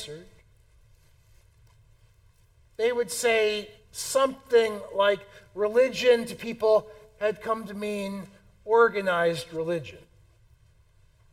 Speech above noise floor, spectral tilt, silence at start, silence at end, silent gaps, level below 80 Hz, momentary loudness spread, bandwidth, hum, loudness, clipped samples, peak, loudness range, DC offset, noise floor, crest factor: 34 dB; -3.5 dB/octave; 0 s; 1.35 s; none; -62 dBFS; 18 LU; 16 kHz; none; -26 LUFS; under 0.1%; -8 dBFS; 5 LU; under 0.1%; -60 dBFS; 20 dB